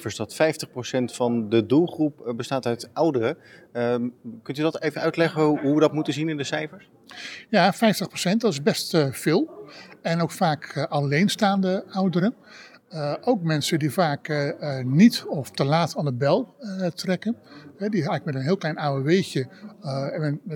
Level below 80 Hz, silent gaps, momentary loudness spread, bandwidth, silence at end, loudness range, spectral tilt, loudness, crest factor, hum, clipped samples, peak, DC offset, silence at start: -76 dBFS; none; 11 LU; 18.5 kHz; 0 s; 3 LU; -6 dB/octave; -24 LUFS; 20 dB; none; under 0.1%; -2 dBFS; under 0.1%; 0 s